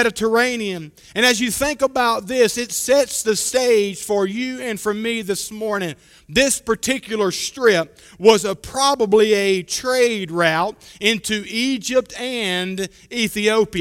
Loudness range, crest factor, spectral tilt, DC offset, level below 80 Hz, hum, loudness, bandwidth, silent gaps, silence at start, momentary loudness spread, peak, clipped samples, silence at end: 4 LU; 20 dB; -3 dB/octave; under 0.1%; -50 dBFS; none; -19 LUFS; 16.5 kHz; none; 0 s; 9 LU; 0 dBFS; under 0.1%; 0 s